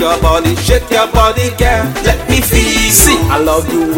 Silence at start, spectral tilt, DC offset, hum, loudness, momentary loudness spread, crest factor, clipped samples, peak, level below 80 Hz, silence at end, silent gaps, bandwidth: 0 s; -3.5 dB/octave; under 0.1%; none; -10 LUFS; 6 LU; 10 dB; 0.1%; 0 dBFS; -18 dBFS; 0 s; none; 17.5 kHz